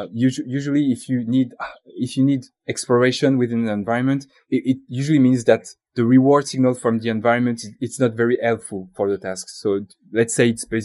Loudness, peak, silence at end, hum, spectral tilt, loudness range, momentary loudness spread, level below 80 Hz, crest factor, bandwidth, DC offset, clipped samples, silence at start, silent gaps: -20 LUFS; -2 dBFS; 0 s; none; -6 dB/octave; 4 LU; 10 LU; -62 dBFS; 18 dB; 12 kHz; under 0.1%; under 0.1%; 0 s; none